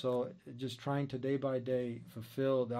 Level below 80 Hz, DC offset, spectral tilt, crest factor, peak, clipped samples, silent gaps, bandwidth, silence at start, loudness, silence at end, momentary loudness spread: -74 dBFS; under 0.1%; -7.5 dB/octave; 14 dB; -22 dBFS; under 0.1%; none; 15 kHz; 0 s; -37 LUFS; 0 s; 10 LU